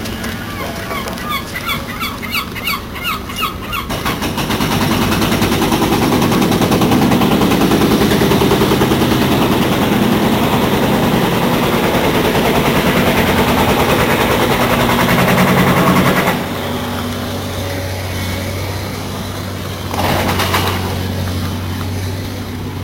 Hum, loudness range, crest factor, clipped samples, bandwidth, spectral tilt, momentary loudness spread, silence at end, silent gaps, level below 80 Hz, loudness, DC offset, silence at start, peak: none; 7 LU; 12 dB; under 0.1%; 16 kHz; -5 dB/octave; 10 LU; 0 s; none; -32 dBFS; -15 LUFS; under 0.1%; 0 s; -2 dBFS